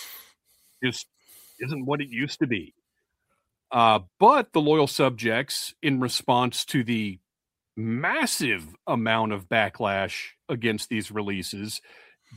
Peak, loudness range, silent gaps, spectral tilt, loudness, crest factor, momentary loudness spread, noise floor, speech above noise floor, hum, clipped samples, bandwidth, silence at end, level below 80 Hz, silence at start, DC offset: -4 dBFS; 6 LU; none; -4.5 dB/octave; -25 LUFS; 22 dB; 14 LU; -87 dBFS; 62 dB; none; under 0.1%; 16 kHz; 0 s; -66 dBFS; 0 s; under 0.1%